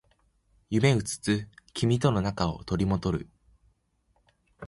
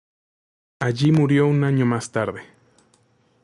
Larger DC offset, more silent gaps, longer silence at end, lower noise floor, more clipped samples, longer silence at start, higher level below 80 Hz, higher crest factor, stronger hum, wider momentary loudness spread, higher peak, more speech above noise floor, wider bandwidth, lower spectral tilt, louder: neither; neither; second, 0 s vs 1 s; first, -70 dBFS vs -61 dBFS; neither; about the same, 0.7 s vs 0.8 s; first, -48 dBFS vs -58 dBFS; first, 20 dB vs 14 dB; neither; second, 7 LU vs 11 LU; about the same, -10 dBFS vs -8 dBFS; about the same, 44 dB vs 42 dB; about the same, 11.5 kHz vs 11.5 kHz; about the same, -6 dB/octave vs -7 dB/octave; second, -28 LUFS vs -20 LUFS